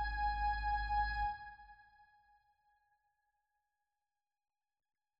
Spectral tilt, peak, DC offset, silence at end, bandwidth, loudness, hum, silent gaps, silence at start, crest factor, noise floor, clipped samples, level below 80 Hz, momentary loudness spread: -1 dB/octave; -26 dBFS; under 0.1%; 3.45 s; 5.4 kHz; -38 LUFS; none; none; 0 s; 18 dB; under -90 dBFS; under 0.1%; -48 dBFS; 16 LU